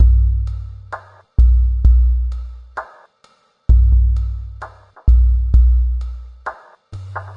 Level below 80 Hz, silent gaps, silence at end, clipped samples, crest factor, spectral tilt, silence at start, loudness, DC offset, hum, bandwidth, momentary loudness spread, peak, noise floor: -16 dBFS; none; 0 s; under 0.1%; 14 dB; -9 dB/octave; 0 s; -16 LUFS; under 0.1%; none; 1.8 kHz; 19 LU; -2 dBFS; -55 dBFS